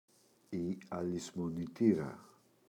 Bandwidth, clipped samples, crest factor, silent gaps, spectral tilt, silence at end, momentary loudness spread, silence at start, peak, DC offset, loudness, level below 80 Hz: 14 kHz; under 0.1%; 22 dB; none; -7 dB/octave; 0.4 s; 13 LU; 0.5 s; -16 dBFS; under 0.1%; -37 LUFS; -68 dBFS